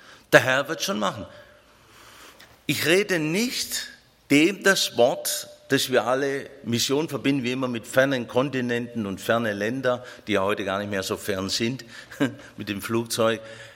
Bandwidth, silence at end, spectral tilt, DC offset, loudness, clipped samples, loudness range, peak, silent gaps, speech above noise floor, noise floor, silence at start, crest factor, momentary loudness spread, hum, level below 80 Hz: 16.5 kHz; 0 s; -3.5 dB/octave; under 0.1%; -24 LUFS; under 0.1%; 4 LU; 0 dBFS; none; 29 dB; -53 dBFS; 0.1 s; 24 dB; 11 LU; none; -64 dBFS